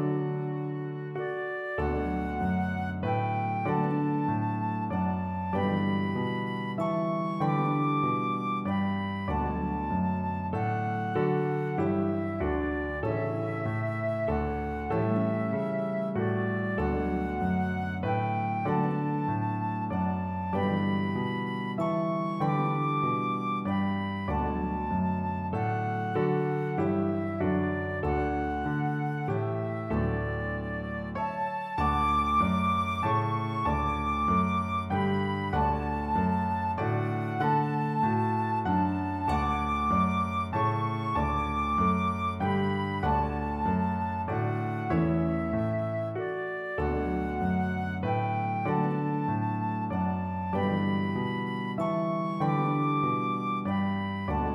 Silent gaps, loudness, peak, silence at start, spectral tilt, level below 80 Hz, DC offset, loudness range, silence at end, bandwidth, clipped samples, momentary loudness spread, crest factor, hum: none; -29 LUFS; -14 dBFS; 0 s; -8.5 dB/octave; -44 dBFS; under 0.1%; 2 LU; 0 s; 11 kHz; under 0.1%; 5 LU; 14 dB; none